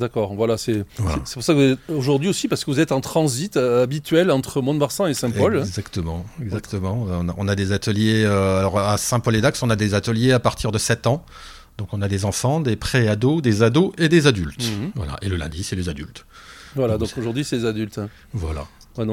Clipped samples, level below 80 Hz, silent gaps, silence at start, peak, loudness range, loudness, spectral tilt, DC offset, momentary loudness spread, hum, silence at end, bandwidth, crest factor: under 0.1%; -40 dBFS; none; 0 s; 0 dBFS; 6 LU; -21 LUFS; -5.5 dB/octave; under 0.1%; 12 LU; none; 0 s; 16.5 kHz; 20 dB